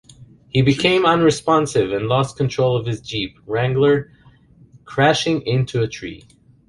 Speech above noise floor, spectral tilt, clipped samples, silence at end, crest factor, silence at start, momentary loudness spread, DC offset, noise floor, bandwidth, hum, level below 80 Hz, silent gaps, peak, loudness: 32 dB; -5.5 dB/octave; under 0.1%; 0.5 s; 18 dB; 0.2 s; 10 LU; under 0.1%; -49 dBFS; 11.5 kHz; none; -48 dBFS; none; -2 dBFS; -18 LUFS